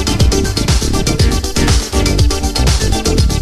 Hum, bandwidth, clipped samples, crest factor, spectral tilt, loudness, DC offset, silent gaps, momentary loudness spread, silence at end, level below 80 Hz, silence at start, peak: none; 14 kHz; under 0.1%; 12 dB; -4.5 dB/octave; -14 LUFS; under 0.1%; none; 1 LU; 0 s; -16 dBFS; 0 s; 0 dBFS